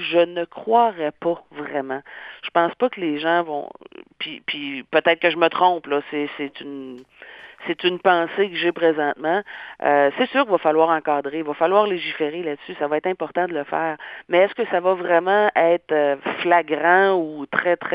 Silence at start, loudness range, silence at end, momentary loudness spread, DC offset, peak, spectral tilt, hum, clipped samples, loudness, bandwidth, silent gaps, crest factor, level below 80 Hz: 0 s; 4 LU; 0 s; 13 LU; under 0.1%; 0 dBFS; -7.5 dB/octave; none; under 0.1%; -21 LUFS; 5.2 kHz; none; 20 dB; -70 dBFS